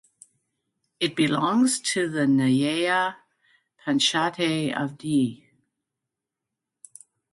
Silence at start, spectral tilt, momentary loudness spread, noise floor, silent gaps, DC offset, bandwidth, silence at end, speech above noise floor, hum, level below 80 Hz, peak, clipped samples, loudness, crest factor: 1 s; -4 dB/octave; 8 LU; -86 dBFS; none; under 0.1%; 11.5 kHz; 1.95 s; 63 dB; none; -70 dBFS; -8 dBFS; under 0.1%; -23 LUFS; 18 dB